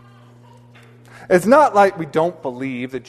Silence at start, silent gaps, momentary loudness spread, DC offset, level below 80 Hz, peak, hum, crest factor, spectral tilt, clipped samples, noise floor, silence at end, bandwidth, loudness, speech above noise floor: 1.2 s; none; 14 LU; under 0.1%; -60 dBFS; 0 dBFS; none; 18 dB; -6 dB/octave; under 0.1%; -46 dBFS; 0.1 s; 13.5 kHz; -16 LUFS; 29 dB